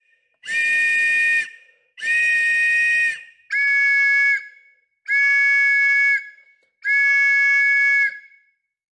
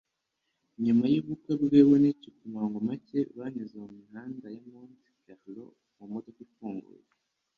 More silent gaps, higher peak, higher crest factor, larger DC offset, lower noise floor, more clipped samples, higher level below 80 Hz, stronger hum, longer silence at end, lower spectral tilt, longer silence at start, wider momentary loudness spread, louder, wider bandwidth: neither; about the same, -10 dBFS vs -8 dBFS; second, 10 dB vs 22 dB; neither; second, -63 dBFS vs -82 dBFS; neither; second, -88 dBFS vs -70 dBFS; neither; about the same, 0.8 s vs 0.75 s; second, 2 dB/octave vs -9.5 dB/octave; second, 0.45 s vs 0.8 s; second, 8 LU vs 25 LU; first, -16 LUFS vs -27 LUFS; first, 11.5 kHz vs 5 kHz